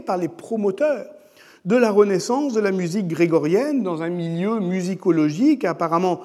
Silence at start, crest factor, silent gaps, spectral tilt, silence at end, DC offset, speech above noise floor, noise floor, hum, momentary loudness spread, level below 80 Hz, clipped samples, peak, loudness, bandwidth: 0 s; 16 dB; none; -6.5 dB/octave; 0 s; under 0.1%; 28 dB; -47 dBFS; none; 8 LU; -80 dBFS; under 0.1%; -4 dBFS; -21 LUFS; 13.5 kHz